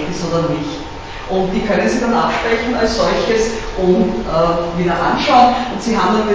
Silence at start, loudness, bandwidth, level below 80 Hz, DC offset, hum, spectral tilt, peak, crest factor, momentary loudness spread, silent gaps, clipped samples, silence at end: 0 s; -15 LUFS; 8 kHz; -34 dBFS; under 0.1%; none; -5.5 dB/octave; 0 dBFS; 16 dB; 8 LU; none; under 0.1%; 0 s